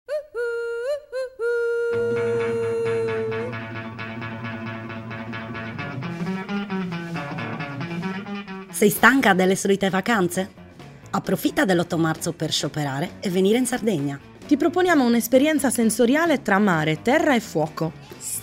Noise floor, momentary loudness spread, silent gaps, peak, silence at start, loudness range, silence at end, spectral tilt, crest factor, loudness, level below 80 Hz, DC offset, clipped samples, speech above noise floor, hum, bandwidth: -43 dBFS; 14 LU; none; 0 dBFS; 0.1 s; 10 LU; 0 s; -5 dB/octave; 22 dB; -23 LUFS; -58 dBFS; under 0.1%; under 0.1%; 23 dB; none; 16 kHz